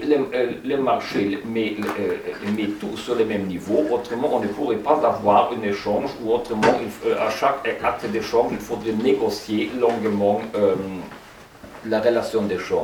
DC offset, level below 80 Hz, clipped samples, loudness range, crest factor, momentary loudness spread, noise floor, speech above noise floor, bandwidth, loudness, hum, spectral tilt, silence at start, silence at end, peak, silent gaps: under 0.1%; -54 dBFS; under 0.1%; 3 LU; 18 dB; 7 LU; -43 dBFS; 21 dB; 19 kHz; -22 LUFS; none; -5.5 dB/octave; 0 s; 0 s; -2 dBFS; none